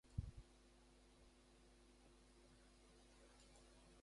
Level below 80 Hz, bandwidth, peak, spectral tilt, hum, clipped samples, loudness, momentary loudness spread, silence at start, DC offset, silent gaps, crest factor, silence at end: -64 dBFS; 11.5 kHz; -32 dBFS; -5.5 dB/octave; none; under 0.1%; -62 LUFS; 16 LU; 0.05 s; under 0.1%; none; 28 dB; 0 s